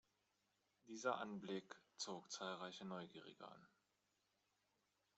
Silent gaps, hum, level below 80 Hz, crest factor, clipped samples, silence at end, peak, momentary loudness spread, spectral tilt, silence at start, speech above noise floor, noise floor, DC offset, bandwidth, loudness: none; 50 Hz at -75 dBFS; under -90 dBFS; 26 dB; under 0.1%; 1.5 s; -28 dBFS; 16 LU; -3 dB/octave; 0.85 s; 36 dB; -87 dBFS; under 0.1%; 8 kHz; -50 LUFS